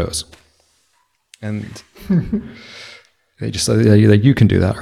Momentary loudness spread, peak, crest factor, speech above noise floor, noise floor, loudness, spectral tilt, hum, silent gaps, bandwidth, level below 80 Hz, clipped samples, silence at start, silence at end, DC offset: 24 LU; 0 dBFS; 16 dB; 47 dB; -63 dBFS; -15 LUFS; -6 dB/octave; none; none; 13 kHz; -40 dBFS; under 0.1%; 0 s; 0 s; under 0.1%